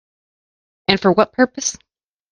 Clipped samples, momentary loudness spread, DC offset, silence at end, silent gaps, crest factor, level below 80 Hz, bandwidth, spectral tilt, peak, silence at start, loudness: under 0.1%; 9 LU; under 0.1%; 0.6 s; none; 20 dB; -54 dBFS; 10.5 kHz; -3.5 dB/octave; 0 dBFS; 0.9 s; -17 LUFS